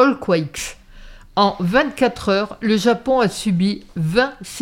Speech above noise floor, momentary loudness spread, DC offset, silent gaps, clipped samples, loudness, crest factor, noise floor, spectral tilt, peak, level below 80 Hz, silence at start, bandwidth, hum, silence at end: 22 dB; 8 LU; under 0.1%; none; under 0.1%; -19 LUFS; 18 dB; -40 dBFS; -5.5 dB/octave; -2 dBFS; -44 dBFS; 0 s; 16.5 kHz; none; 0 s